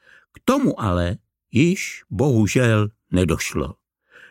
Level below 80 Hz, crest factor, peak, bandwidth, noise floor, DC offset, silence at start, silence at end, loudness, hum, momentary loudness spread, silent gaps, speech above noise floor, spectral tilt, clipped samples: -42 dBFS; 18 dB; -4 dBFS; 16.5 kHz; -51 dBFS; under 0.1%; 0.45 s; 0.6 s; -21 LUFS; none; 10 LU; none; 31 dB; -6 dB/octave; under 0.1%